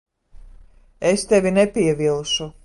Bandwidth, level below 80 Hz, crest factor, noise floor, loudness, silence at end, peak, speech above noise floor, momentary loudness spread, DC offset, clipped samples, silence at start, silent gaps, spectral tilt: 11.5 kHz; -46 dBFS; 18 dB; -47 dBFS; -19 LUFS; 0.15 s; -4 dBFS; 28 dB; 6 LU; under 0.1%; under 0.1%; 0.35 s; none; -4.5 dB/octave